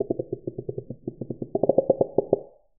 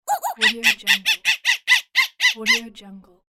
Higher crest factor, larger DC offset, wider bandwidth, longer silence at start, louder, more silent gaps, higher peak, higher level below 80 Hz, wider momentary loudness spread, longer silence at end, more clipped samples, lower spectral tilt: about the same, 24 dB vs 20 dB; first, 0.2% vs under 0.1%; second, 1.2 kHz vs 17 kHz; about the same, 0 s vs 0.05 s; second, -27 LUFS vs -17 LUFS; neither; about the same, -4 dBFS vs -2 dBFS; first, -58 dBFS vs -64 dBFS; first, 13 LU vs 4 LU; about the same, 0.35 s vs 0.35 s; neither; first, -3 dB/octave vs 0.5 dB/octave